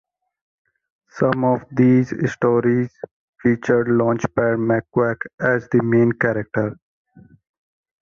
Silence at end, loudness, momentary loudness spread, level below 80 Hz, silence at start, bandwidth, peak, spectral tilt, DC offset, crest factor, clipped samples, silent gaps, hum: 1.3 s; -19 LUFS; 7 LU; -54 dBFS; 1.15 s; 7 kHz; -4 dBFS; -8.5 dB/octave; under 0.1%; 16 dB; under 0.1%; 3.11-3.33 s, 5.34-5.38 s; none